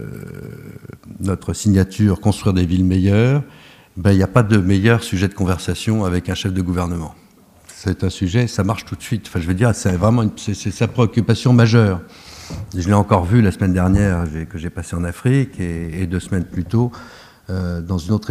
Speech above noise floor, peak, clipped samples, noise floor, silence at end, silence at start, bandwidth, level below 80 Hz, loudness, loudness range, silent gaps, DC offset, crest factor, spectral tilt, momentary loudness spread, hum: 30 dB; 0 dBFS; under 0.1%; -47 dBFS; 0 s; 0 s; 14.5 kHz; -38 dBFS; -18 LUFS; 5 LU; none; under 0.1%; 18 dB; -7 dB/octave; 13 LU; none